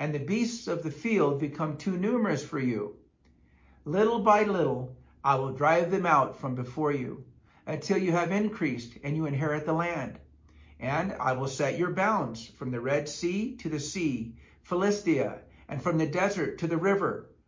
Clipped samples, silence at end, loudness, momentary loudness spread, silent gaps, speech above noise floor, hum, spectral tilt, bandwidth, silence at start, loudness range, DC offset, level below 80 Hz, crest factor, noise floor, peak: under 0.1%; 0.2 s; -29 LUFS; 12 LU; none; 34 dB; none; -6 dB/octave; 7.6 kHz; 0 s; 4 LU; under 0.1%; -60 dBFS; 20 dB; -62 dBFS; -8 dBFS